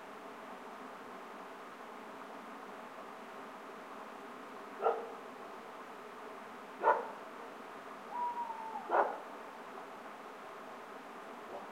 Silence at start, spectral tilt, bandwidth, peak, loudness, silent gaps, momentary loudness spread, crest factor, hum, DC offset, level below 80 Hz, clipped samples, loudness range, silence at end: 0 s; -4 dB/octave; 16.5 kHz; -16 dBFS; -42 LUFS; none; 15 LU; 26 dB; none; under 0.1%; -88 dBFS; under 0.1%; 11 LU; 0 s